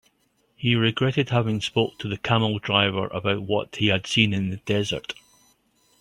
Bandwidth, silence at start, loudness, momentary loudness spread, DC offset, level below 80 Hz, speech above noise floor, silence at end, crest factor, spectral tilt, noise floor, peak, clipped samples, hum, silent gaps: 11.5 kHz; 0.6 s; -23 LUFS; 7 LU; under 0.1%; -56 dBFS; 44 dB; 0.9 s; 22 dB; -5.5 dB/octave; -67 dBFS; -2 dBFS; under 0.1%; none; none